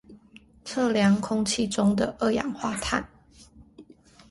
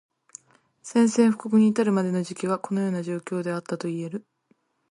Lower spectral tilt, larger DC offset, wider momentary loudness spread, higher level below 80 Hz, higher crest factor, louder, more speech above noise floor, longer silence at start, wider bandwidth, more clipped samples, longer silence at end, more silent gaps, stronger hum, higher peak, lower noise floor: second, -5 dB/octave vs -6.5 dB/octave; neither; second, 9 LU vs 12 LU; first, -52 dBFS vs -72 dBFS; about the same, 18 dB vs 18 dB; about the same, -25 LUFS vs -24 LUFS; second, 29 dB vs 44 dB; second, 0.1 s vs 0.85 s; about the same, 11.5 kHz vs 11.5 kHz; neither; second, 0.5 s vs 0.7 s; neither; neither; about the same, -8 dBFS vs -8 dBFS; second, -54 dBFS vs -67 dBFS